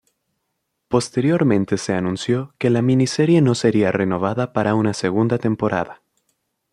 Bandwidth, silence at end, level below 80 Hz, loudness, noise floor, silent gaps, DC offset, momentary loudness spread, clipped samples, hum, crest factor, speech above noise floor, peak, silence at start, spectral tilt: 11.5 kHz; 0.75 s; -56 dBFS; -19 LUFS; -75 dBFS; none; under 0.1%; 6 LU; under 0.1%; none; 16 dB; 57 dB; -2 dBFS; 0.9 s; -6.5 dB/octave